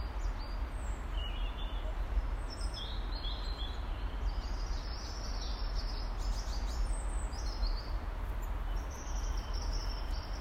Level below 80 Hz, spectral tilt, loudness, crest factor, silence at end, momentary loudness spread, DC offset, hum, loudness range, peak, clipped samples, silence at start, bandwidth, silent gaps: -36 dBFS; -4.5 dB/octave; -40 LUFS; 14 dB; 0 s; 3 LU; under 0.1%; none; 1 LU; -22 dBFS; under 0.1%; 0 s; 9.6 kHz; none